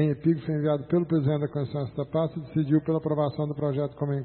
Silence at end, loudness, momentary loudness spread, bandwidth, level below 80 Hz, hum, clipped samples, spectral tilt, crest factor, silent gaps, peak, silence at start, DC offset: 0 s; -27 LUFS; 5 LU; 4.4 kHz; -58 dBFS; none; under 0.1%; -13 dB/octave; 16 dB; none; -10 dBFS; 0 s; under 0.1%